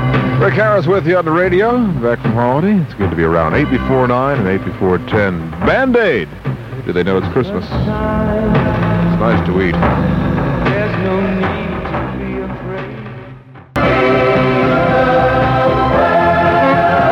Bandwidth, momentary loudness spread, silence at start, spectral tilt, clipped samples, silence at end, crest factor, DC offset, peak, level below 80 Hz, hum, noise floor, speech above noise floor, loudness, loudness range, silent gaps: 7.8 kHz; 9 LU; 0 s; -8.5 dB/octave; under 0.1%; 0 s; 12 dB; under 0.1%; 0 dBFS; -30 dBFS; none; -35 dBFS; 21 dB; -14 LUFS; 5 LU; none